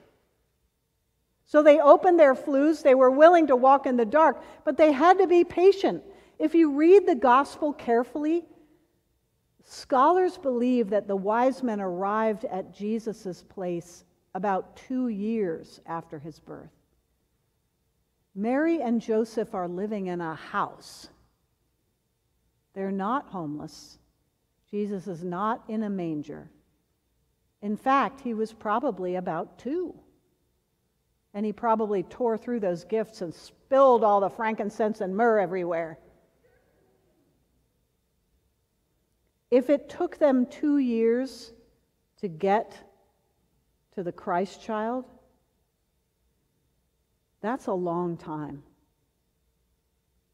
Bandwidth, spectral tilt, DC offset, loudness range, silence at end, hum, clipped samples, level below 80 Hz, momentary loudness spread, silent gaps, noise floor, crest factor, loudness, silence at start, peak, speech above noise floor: 12 kHz; -6.5 dB/octave; under 0.1%; 15 LU; 1.75 s; none; under 0.1%; -68 dBFS; 18 LU; none; -74 dBFS; 22 dB; -24 LUFS; 1.55 s; -4 dBFS; 50 dB